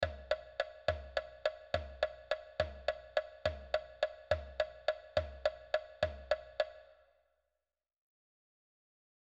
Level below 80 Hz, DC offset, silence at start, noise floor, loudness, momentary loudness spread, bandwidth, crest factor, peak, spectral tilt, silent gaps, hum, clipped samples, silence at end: -54 dBFS; under 0.1%; 0 s; under -90 dBFS; -39 LUFS; 4 LU; 8.4 kHz; 24 dB; -16 dBFS; -4.5 dB/octave; none; none; under 0.1%; 2.35 s